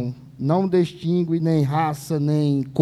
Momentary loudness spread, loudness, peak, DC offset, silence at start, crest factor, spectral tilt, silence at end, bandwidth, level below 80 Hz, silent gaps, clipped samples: 4 LU; -22 LUFS; -6 dBFS; under 0.1%; 0 s; 14 dB; -8 dB/octave; 0 s; 13 kHz; -58 dBFS; none; under 0.1%